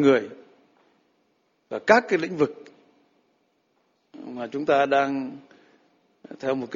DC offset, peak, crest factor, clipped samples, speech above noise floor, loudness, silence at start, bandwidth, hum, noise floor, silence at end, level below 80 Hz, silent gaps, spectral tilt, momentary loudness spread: under 0.1%; -2 dBFS; 24 dB; under 0.1%; 46 dB; -24 LUFS; 0 s; 7.6 kHz; none; -69 dBFS; 0 s; -70 dBFS; none; -5.5 dB/octave; 23 LU